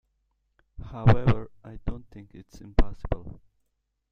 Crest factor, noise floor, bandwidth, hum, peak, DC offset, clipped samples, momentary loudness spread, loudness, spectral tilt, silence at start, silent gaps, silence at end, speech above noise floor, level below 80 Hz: 22 dB; -77 dBFS; 6.4 kHz; none; -4 dBFS; under 0.1%; under 0.1%; 25 LU; -28 LUFS; -9 dB/octave; 0.8 s; none; 0.75 s; 53 dB; -34 dBFS